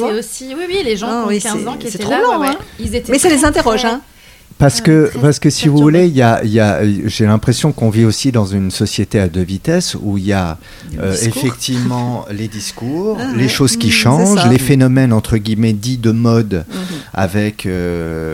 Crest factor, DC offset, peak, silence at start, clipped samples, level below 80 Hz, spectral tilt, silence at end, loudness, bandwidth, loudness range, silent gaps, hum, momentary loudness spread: 14 dB; under 0.1%; 0 dBFS; 0 s; under 0.1%; -36 dBFS; -5.5 dB/octave; 0 s; -14 LUFS; 16.5 kHz; 5 LU; none; none; 11 LU